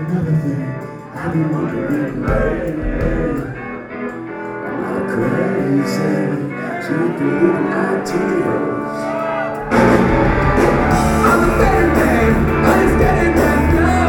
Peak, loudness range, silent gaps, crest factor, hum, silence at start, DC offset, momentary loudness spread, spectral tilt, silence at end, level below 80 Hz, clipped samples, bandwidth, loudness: 0 dBFS; 8 LU; none; 16 dB; none; 0 s; under 0.1%; 12 LU; -7 dB/octave; 0 s; -26 dBFS; under 0.1%; 18 kHz; -16 LUFS